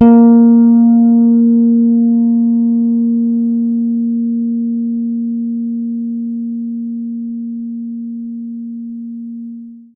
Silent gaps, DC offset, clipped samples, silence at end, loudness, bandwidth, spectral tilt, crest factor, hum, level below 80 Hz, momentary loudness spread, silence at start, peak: none; under 0.1%; under 0.1%; 0.15 s; -13 LUFS; 1.5 kHz; -13 dB/octave; 12 dB; none; -58 dBFS; 18 LU; 0 s; 0 dBFS